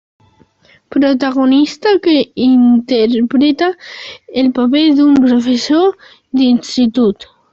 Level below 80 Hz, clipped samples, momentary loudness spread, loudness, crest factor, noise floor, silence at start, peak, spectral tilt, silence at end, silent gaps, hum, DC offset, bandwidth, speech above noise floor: -54 dBFS; under 0.1%; 10 LU; -12 LUFS; 10 dB; -49 dBFS; 0.9 s; -2 dBFS; -5 dB/octave; 0.4 s; none; none; under 0.1%; 7.6 kHz; 38 dB